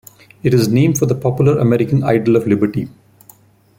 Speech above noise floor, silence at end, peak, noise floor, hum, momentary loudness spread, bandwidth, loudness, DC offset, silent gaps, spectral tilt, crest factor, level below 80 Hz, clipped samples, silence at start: 34 dB; 0.9 s; -2 dBFS; -47 dBFS; none; 7 LU; 16.5 kHz; -15 LUFS; under 0.1%; none; -7 dB/octave; 14 dB; -48 dBFS; under 0.1%; 0.45 s